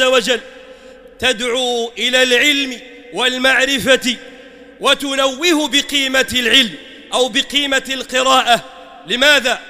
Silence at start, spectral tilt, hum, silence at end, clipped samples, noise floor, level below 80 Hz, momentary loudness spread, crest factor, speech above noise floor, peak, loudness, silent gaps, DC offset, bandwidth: 0 s; -1 dB/octave; none; 0 s; under 0.1%; -39 dBFS; -48 dBFS; 9 LU; 16 dB; 24 dB; 0 dBFS; -14 LUFS; none; under 0.1%; 16 kHz